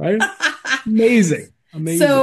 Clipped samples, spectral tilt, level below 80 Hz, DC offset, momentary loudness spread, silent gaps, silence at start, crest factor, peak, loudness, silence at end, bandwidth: under 0.1%; -4.5 dB/octave; -60 dBFS; under 0.1%; 11 LU; none; 0 s; 14 dB; -2 dBFS; -17 LUFS; 0 s; 12.5 kHz